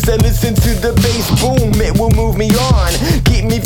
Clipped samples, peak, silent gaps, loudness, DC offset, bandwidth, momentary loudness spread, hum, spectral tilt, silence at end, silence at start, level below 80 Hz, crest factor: under 0.1%; 0 dBFS; none; -13 LUFS; under 0.1%; 19 kHz; 1 LU; none; -5.5 dB/octave; 0 s; 0 s; -16 dBFS; 10 dB